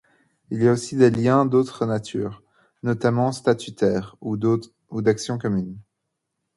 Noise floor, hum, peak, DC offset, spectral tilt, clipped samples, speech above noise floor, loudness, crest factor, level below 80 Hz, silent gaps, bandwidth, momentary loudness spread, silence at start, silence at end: -79 dBFS; none; -4 dBFS; under 0.1%; -7 dB/octave; under 0.1%; 58 dB; -22 LUFS; 20 dB; -56 dBFS; none; 11.5 kHz; 12 LU; 0.5 s; 0.75 s